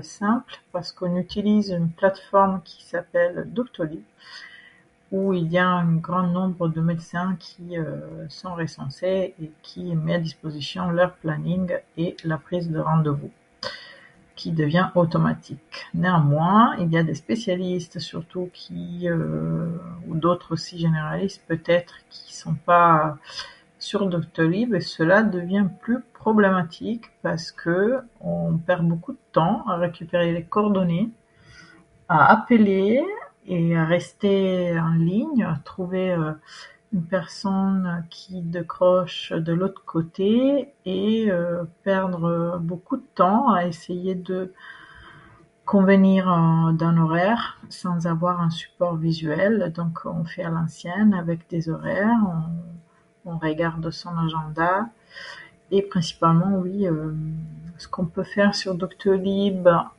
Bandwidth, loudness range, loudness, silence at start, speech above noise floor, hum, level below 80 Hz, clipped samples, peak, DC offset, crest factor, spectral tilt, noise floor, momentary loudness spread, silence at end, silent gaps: 10 kHz; 6 LU; -23 LUFS; 0 s; 32 dB; none; -56 dBFS; under 0.1%; -2 dBFS; under 0.1%; 22 dB; -7.5 dB/octave; -54 dBFS; 15 LU; 0.1 s; none